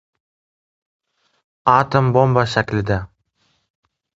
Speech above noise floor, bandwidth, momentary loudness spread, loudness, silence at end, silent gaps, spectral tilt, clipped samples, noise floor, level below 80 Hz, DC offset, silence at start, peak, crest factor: 49 dB; 7.8 kHz; 9 LU; -17 LUFS; 1.1 s; none; -7 dB/octave; under 0.1%; -65 dBFS; -44 dBFS; under 0.1%; 1.65 s; 0 dBFS; 20 dB